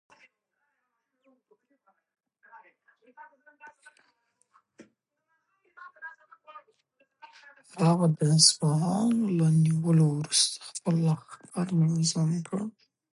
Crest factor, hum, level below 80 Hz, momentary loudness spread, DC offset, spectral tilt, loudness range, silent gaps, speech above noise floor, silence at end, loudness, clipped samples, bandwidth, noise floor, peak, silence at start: 24 dB; none; -74 dBFS; 20 LU; under 0.1%; -5 dB/octave; 6 LU; none; 55 dB; 0.45 s; -25 LUFS; under 0.1%; 11.5 kHz; -80 dBFS; -6 dBFS; 2.55 s